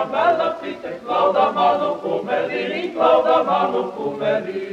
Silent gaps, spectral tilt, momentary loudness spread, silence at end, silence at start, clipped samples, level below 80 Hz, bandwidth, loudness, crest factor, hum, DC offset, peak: none; -6 dB/octave; 8 LU; 0 s; 0 s; under 0.1%; -64 dBFS; 8.6 kHz; -19 LUFS; 16 dB; none; under 0.1%; -4 dBFS